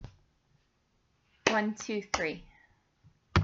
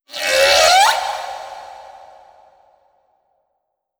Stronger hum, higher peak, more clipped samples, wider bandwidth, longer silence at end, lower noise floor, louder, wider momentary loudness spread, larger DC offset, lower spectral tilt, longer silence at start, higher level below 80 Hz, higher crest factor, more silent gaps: neither; second, -6 dBFS vs 0 dBFS; neither; second, 7.8 kHz vs over 20 kHz; second, 0 s vs 2.15 s; about the same, -73 dBFS vs -73 dBFS; second, -32 LUFS vs -13 LUFS; second, 14 LU vs 24 LU; neither; first, -4.5 dB/octave vs 1.5 dB/octave; about the same, 0 s vs 0.1 s; about the same, -52 dBFS vs -52 dBFS; first, 28 dB vs 18 dB; neither